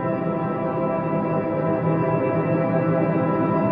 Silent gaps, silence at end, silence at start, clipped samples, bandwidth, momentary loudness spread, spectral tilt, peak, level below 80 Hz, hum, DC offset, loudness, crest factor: none; 0 s; 0 s; under 0.1%; 4.7 kHz; 3 LU; -12 dB/octave; -8 dBFS; -56 dBFS; none; under 0.1%; -22 LUFS; 14 dB